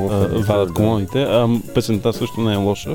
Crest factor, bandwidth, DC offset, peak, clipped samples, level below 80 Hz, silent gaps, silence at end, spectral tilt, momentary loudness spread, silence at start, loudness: 14 dB; 18.5 kHz; under 0.1%; -4 dBFS; under 0.1%; -44 dBFS; none; 0 s; -6.5 dB/octave; 3 LU; 0 s; -18 LUFS